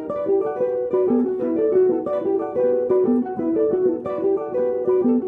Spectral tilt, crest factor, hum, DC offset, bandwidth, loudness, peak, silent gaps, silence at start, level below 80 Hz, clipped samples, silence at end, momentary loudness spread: -10.5 dB/octave; 12 dB; none; under 0.1%; 3.6 kHz; -21 LUFS; -8 dBFS; none; 0 s; -60 dBFS; under 0.1%; 0 s; 4 LU